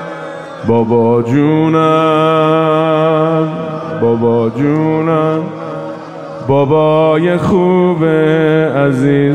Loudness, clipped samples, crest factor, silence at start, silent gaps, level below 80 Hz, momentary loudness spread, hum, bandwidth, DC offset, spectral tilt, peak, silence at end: -12 LUFS; under 0.1%; 10 dB; 0 s; none; -48 dBFS; 13 LU; none; 9.4 kHz; under 0.1%; -8.5 dB/octave; 0 dBFS; 0 s